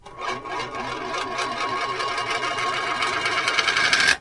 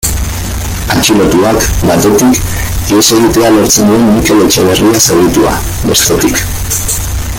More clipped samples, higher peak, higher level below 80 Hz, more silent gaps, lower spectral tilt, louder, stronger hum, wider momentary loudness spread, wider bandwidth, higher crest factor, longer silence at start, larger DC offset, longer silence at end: second, under 0.1% vs 0.2%; about the same, -2 dBFS vs 0 dBFS; second, -54 dBFS vs -20 dBFS; neither; second, -1 dB/octave vs -4 dB/octave; second, -23 LUFS vs -8 LUFS; neither; first, 11 LU vs 8 LU; second, 11.5 kHz vs over 20 kHz; first, 22 dB vs 8 dB; about the same, 0.05 s vs 0 s; neither; about the same, 0 s vs 0 s